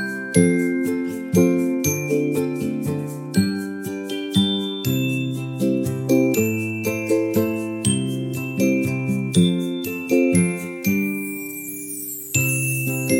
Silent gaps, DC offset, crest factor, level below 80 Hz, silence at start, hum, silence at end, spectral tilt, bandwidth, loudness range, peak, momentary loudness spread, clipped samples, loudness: none; under 0.1%; 20 dB; -58 dBFS; 0 s; none; 0 s; -5 dB/octave; 17 kHz; 2 LU; -2 dBFS; 9 LU; under 0.1%; -21 LUFS